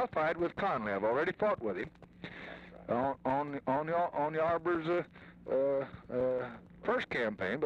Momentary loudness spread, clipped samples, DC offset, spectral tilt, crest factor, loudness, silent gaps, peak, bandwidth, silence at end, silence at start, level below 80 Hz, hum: 14 LU; under 0.1%; under 0.1%; -7.5 dB/octave; 14 dB; -34 LUFS; none; -22 dBFS; 7.8 kHz; 0 s; 0 s; -64 dBFS; none